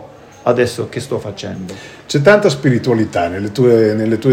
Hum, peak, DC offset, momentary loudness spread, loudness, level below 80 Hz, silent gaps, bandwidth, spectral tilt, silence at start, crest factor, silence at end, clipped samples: none; 0 dBFS; under 0.1%; 15 LU; -14 LUFS; -52 dBFS; none; 16 kHz; -6.5 dB/octave; 0 s; 14 dB; 0 s; 0.2%